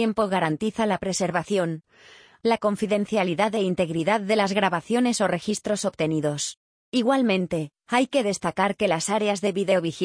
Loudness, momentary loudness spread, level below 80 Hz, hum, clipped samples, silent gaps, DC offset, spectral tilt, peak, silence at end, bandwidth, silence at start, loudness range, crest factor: -24 LUFS; 5 LU; -60 dBFS; none; under 0.1%; 6.57-6.92 s; under 0.1%; -4.5 dB/octave; -8 dBFS; 0 s; 10.5 kHz; 0 s; 2 LU; 16 dB